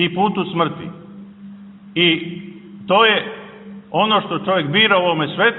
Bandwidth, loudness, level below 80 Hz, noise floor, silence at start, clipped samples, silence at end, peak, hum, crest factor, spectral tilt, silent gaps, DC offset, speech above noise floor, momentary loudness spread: 4.3 kHz; -16 LUFS; -60 dBFS; -38 dBFS; 0 s; under 0.1%; 0 s; 0 dBFS; none; 18 dB; -9 dB/octave; none; under 0.1%; 21 dB; 23 LU